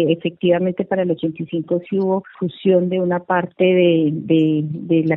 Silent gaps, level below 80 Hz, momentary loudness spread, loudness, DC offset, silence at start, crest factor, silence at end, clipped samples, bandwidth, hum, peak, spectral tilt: none; -62 dBFS; 7 LU; -18 LUFS; under 0.1%; 0 s; 14 dB; 0 s; under 0.1%; 4.1 kHz; none; -4 dBFS; -10.5 dB/octave